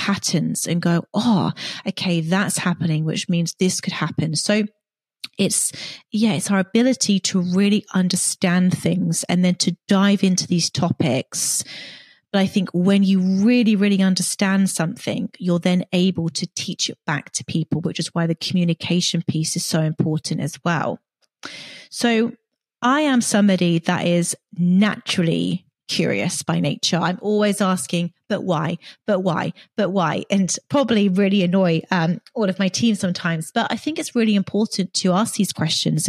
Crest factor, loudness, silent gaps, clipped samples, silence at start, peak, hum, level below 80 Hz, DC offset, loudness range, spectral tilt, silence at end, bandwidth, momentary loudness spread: 16 dB; -20 LUFS; none; under 0.1%; 0 s; -4 dBFS; none; -64 dBFS; under 0.1%; 4 LU; -4.5 dB/octave; 0 s; 14 kHz; 8 LU